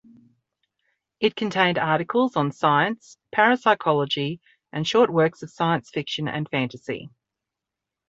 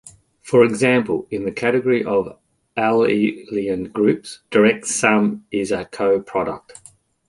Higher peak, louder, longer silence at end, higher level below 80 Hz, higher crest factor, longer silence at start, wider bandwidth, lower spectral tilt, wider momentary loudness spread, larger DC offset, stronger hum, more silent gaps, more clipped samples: about the same, -4 dBFS vs -2 dBFS; second, -23 LUFS vs -19 LUFS; first, 1 s vs 0.7 s; second, -66 dBFS vs -56 dBFS; about the same, 20 dB vs 18 dB; first, 1.2 s vs 0.05 s; second, 8 kHz vs 11.5 kHz; about the same, -5.5 dB/octave vs -5 dB/octave; about the same, 11 LU vs 9 LU; neither; neither; neither; neither